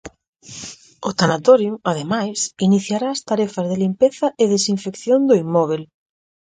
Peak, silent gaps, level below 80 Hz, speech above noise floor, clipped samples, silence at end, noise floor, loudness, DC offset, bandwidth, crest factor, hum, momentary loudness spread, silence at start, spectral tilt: 0 dBFS; 0.28-0.33 s; -60 dBFS; 19 dB; under 0.1%; 0.7 s; -37 dBFS; -18 LUFS; under 0.1%; 9.4 kHz; 18 dB; none; 13 LU; 0.05 s; -5 dB/octave